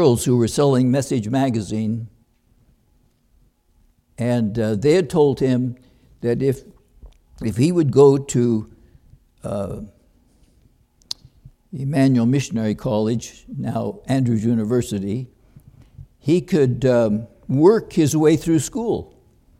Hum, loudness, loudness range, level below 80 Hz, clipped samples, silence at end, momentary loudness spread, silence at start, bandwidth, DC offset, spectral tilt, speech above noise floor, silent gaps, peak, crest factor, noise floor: none; -19 LUFS; 8 LU; -48 dBFS; under 0.1%; 0.55 s; 14 LU; 0 s; 15.5 kHz; under 0.1%; -7 dB/octave; 42 dB; none; -2 dBFS; 18 dB; -60 dBFS